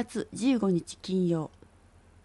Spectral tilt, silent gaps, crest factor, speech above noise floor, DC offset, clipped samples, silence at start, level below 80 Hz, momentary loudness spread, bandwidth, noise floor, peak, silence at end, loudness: -6.5 dB/octave; none; 14 dB; 29 dB; under 0.1%; under 0.1%; 0 s; -60 dBFS; 8 LU; 11.5 kHz; -58 dBFS; -16 dBFS; 0.75 s; -29 LUFS